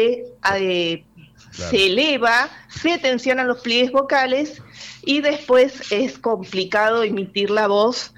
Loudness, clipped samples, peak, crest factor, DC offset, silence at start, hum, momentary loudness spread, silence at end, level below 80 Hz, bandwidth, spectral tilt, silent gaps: -19 LUFS; under 0.1%; -6 dBFS; 14 dB; under 0.1%; 0 s; none; 8 LU; 0.1 s; -54 dBFS; 13.5 kHz; -3.5 dB/octave; none